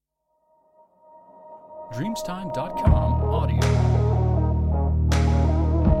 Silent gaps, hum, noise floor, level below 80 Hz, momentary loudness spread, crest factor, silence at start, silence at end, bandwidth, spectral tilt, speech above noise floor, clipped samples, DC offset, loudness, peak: none; none; -71 dBFS; -26 dBFS; 10 LU; 16 dB; 1.45 s; 0 s; 11.5 kHz; -7.5 dB/octave; 49 dB; under 0.1%; under 0.1%; -22 LUFS; -6 dBFS